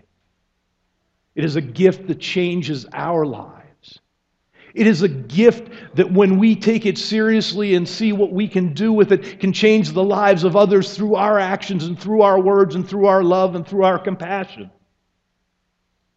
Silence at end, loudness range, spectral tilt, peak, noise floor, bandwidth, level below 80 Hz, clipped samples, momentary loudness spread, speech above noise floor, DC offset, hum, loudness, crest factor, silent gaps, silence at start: 1.5 s; 6 LU; -6.5 dB/octave; 0 dBFS; -71 dBFS; 8 kHz; -60 dBFS; under 0.1%; 10 LU; 54 dB; under 0.1%; none; -17 LUFS; 18 dB; none; 1.35 s